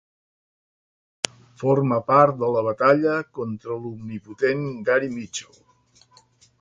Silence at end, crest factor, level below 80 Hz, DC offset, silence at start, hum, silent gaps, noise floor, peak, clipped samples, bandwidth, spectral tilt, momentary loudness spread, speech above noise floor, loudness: 1.15 s; 22 dB; -64 dBFS; under 0.1%; 1.6 s; none; none; -58 dBFS; -2 dBFS; under 0.1%; 11.5 kHz; -5.5 dB/octave; 15 LU; 36 dB; -22 LUFS